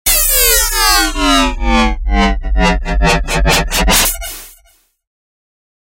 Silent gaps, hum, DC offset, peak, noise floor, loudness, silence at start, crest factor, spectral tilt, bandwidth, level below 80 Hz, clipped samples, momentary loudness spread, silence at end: none; none; under 0.1%; 0 dBFS; -52 dBFS; -11 LUFS; 0.05 s; 14 dB; -2.5 dB/octave; 16.5 kHz; -18 dBFS; under 0.1%; 6 LU; 1.5 s